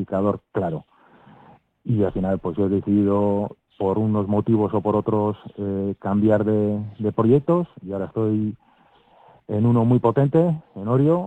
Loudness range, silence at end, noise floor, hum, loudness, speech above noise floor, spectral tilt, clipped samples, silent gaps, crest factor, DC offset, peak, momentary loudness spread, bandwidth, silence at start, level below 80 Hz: 2 LU; 0 s; -56 dBFS; none; -22 LUFS; 36 dB; -11 dB/octave; under 0.1%; none; 16 dB; under 0.1%; -6 dBFS; 10 LU; 4 kHz; 0 s; -52 dBFS